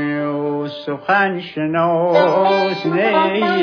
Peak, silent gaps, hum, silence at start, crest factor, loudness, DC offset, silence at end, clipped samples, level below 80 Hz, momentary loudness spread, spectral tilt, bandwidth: -2 dBFS; none; none; 0 s; 14 dB; -17 LUFS; under 0.1%; 0 s; under 0.1%; -68 dBFS; 9 LU; -7 dB/octave; 5.4 kHz